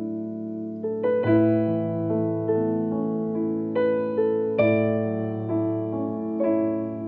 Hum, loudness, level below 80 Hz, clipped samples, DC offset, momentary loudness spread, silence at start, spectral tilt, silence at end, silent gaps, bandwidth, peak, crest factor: none; -25 LUFS; -64 dBFS; under 0.1%; under 0.1%; 8 LU; 0 s; -8.5 dB/octave; 0 s; none; 4.3 kHz; -10 dBFS; 14 dB